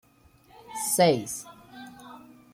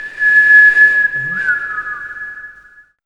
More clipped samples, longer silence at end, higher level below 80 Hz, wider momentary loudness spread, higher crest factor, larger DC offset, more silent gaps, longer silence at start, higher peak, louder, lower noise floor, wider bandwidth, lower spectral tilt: neither; second, 0.35 s vs 0.55 s; second, -68 dBFS vs -54 dBFS; first, 24 LU vs 20 LU; first, 22 dB vs 14 dB; neither; neither; first, 0.7 s vs 0 s; second, -8 dBFS vs 0 dBFS; second, -25 LUFS vs -9 LUFS; first, -59 dBFS vs -44 dBFS; first, 17 kHz vs 9.8 kHz; about the same, -3.5 dB/octave vs -2.5 dB/octave